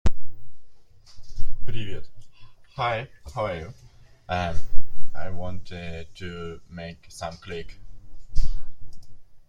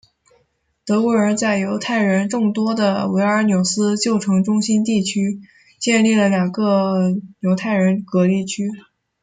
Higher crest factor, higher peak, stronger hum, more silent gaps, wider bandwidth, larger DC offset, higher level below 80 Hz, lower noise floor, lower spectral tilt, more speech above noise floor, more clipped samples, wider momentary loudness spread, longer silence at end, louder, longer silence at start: about the same, 18 dB vs 14 dB; first, 0 dBFS vs -4 dBFS; neither; neither; second, 7.2 kHz vs 9.4 kHz; neither; first, -34 dBFS vs -62 dBFS; second, -42 dBFS vs -65 dBFS; about the same, -6 dB/octave vs -5.5 dB/octave; second, 21 dB vs 48 dB; neither; first, 24 LU vs 7 LU; second, 0.1 s vs 0.4 s; second, -34 LUFS vs -18 LUFS; second, 0.05 s vs 0.85 s